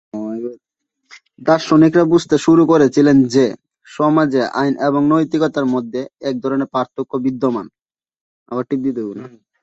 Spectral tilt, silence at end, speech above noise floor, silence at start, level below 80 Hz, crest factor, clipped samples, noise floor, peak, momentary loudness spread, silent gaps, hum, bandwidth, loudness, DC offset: -6.5 dB/octave; 0.35 s; 59 dB; 0.15 s; -56 dBFS; 14 dB; under 0.1%; -74 dBFS; -2 dBFS; 15 LU; 7.82-7.86 s, 8.21-8.46 s; none; 8 kHz; -16 LUFS; under 0.1%